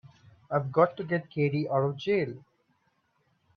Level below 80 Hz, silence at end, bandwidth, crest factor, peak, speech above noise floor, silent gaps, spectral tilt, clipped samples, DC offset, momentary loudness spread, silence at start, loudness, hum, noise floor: -70 dBFS; 1.15 s; 6.4 kHz; 22 dB; -8 dBFS; 45 dB; none; -8.5 dB/octave; under 0.1%; under 0.1%; 7 LU; 0.05 s; -28 LUFS; none; -72 dBFS